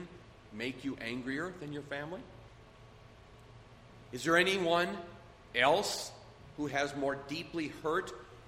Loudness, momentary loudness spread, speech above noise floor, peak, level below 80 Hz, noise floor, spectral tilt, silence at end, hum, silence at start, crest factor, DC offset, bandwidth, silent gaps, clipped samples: -34 LUFS; 23 LU; 22 dB; -12 dBFS; -62 dBFS; -56 dBFS; -4 dB/octave; 0 s; none; 0 s; 24 dB; under 0.1%; 16 kHz; none; under 0.1%